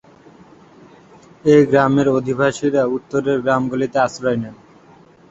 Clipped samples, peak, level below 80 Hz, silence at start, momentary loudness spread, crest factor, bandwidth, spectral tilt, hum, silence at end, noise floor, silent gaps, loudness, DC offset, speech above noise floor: under 0.1%; 0 dBFS; -54 dBFS; 1.45 s; 9 LU; 18 dB; 8 kHz; -6.5 dB/octave; none; 0.75 s; -47 dBFS; none; -17 LUFS; under 0.1%; 31 dB